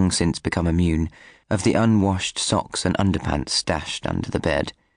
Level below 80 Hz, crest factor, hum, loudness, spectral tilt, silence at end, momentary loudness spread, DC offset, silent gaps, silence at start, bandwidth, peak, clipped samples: -40 dBFS; 12 dB; none; -22 LUFS; -5 dB/octave; 0.25 s; 7 LU; 0.1%; none; 0 s; 10 kHz; -8 dBFS; under 0.1%